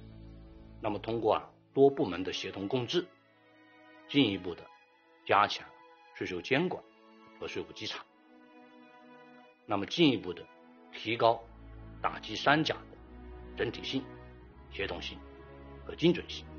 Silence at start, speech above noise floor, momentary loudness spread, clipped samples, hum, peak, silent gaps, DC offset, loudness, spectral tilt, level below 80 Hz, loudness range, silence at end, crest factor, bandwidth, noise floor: 0 s; 32 dB; 24 LU; under 0.1%; none; -8 dBFS; none; under 0.1%; -32 LUFS; -3.5 dB/octave; -58 dBFS; 6 LU; 0 s; 26 dB; 6.8 kHz; -63 dBFS